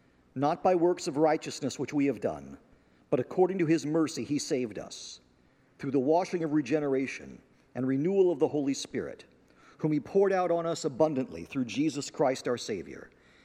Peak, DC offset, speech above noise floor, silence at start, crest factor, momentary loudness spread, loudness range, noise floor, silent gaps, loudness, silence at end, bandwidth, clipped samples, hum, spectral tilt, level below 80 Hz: -12 dBFS; under 0.1%; 35 dB; 0.35 s; 18 dB; 16 LU; 2 LU; -64 dBFS; none; -29 LUFS; 0.4 s; 14 kHz; under 0.1%; none; -5.5 dB/octave; -70 dBFS